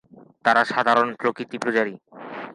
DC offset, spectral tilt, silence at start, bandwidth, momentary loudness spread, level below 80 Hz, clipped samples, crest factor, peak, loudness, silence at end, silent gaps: under 0.1%; -4.5 dB/octave; 0.45 s; 11.5 kHz; 17 LU; -74 dBFS; under 0.1%; 20 dB; -4 dBFS; -22 LUFS; 0 s; none